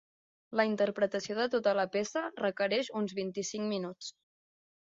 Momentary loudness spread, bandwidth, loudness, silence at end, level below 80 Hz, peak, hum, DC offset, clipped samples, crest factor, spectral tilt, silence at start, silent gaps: 7 LU; 7.8 kHz; -33 LUFS; 0.75 s; -78 dBFS; -14 dBFS; none; under 0.1%; under 0.1%; 20 dB; -4 dB/octave; 0.5 s; none